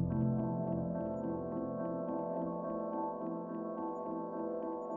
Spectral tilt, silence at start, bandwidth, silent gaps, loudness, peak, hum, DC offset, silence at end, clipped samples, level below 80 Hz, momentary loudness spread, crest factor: -12 dB/octave; 0 s; 3 kHz; none; -38 LUFS; -22 dBFS; none; under 0.1%; 0 s; under 0.1%; -62 dBFS; 6 LU; 14 dB